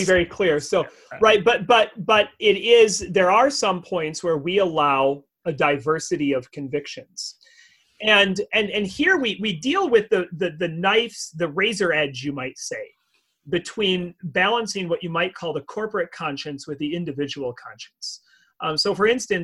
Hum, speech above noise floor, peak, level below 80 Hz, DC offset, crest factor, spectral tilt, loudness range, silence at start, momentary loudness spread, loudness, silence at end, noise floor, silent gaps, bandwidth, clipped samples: none; 46 dB; -2 dBFS; -56 dBFS; under 0.1%; 20 dB; -3.5 dB/octave; 8 LU; 0 s; 15 LU; -21 LUFS; 0 s; -68 dBFS; none; 12 kHz; under 0.1%